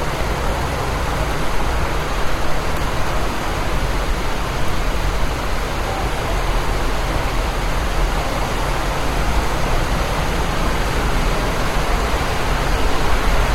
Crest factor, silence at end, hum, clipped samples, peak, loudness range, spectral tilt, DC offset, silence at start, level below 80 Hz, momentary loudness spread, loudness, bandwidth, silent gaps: 14 dB; 0 s; none; under 0.1%; -4 dBFS; 2 LU; -4.5 dB/octave; under 0.1%; 0 s; -22 dBFS; 3 LU; -21 LUFS; 16 kHz; none